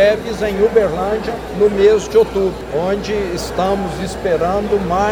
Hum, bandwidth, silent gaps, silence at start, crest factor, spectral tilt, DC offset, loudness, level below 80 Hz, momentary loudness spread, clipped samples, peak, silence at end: none; 19.5 kHz; none; 0 s; 14 dB; -5.5 dB/octave; under 0.1%; -16 LUFS; -34 dBFS; 8 LU; under 0.1%; 0 dBFS; 0 s